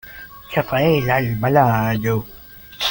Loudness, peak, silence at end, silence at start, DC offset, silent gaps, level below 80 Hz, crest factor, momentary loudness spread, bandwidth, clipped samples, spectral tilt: -18 LUFS; -2 dBFS; 0 s; 0.05 s; under 0.1%; none; -44 dBFS; 18 dB; 21 LU; 17 kHz; under 0.1%; -6.5 dB/octave